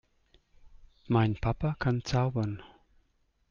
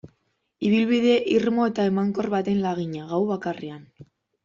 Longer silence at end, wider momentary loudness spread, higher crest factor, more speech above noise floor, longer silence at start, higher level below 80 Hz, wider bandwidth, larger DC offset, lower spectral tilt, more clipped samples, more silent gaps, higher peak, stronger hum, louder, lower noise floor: first, 0.85 s vs 0.4 s; second, 7 LU vs 11 LU; about the same, 18 dB vs 16 dB; second, 43 dB vs 49 dB; first, 0.65 s vs 0.05 s; first, -48 dBFS vs -62 dBFS; about the same, 7.2 kHz vs 7.4 kHz; neither; about the same, -7.5 dB/octave vs -7 dB/octave; neither; neither; second, -14 dBFS vs -8 dBFS; neither; second, -30 LUFS vs -23 LUFS; about the same, -72 dBFS vs -71 dBFS